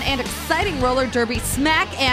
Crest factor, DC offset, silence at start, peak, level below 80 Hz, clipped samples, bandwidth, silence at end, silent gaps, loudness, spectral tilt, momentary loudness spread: 16 dB; under 0.1%; 0 s; -4 dBFS; -34 dBFS; under 0.1%; 16 kHz; 0 s; none; -20 LUFS; -3.5 dB/octave; 4 LU